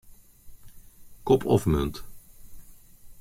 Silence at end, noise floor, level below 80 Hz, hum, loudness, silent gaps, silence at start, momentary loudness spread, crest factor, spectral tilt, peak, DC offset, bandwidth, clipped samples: 0 s; -48 dBFS; -42 dBFS; none; -25 LUFS; none; 0.1 s; 18 LU; 22 dB; -7 dB/octave; -8 dBFS; under 0.1%; 16.5 kHz; under 0.1%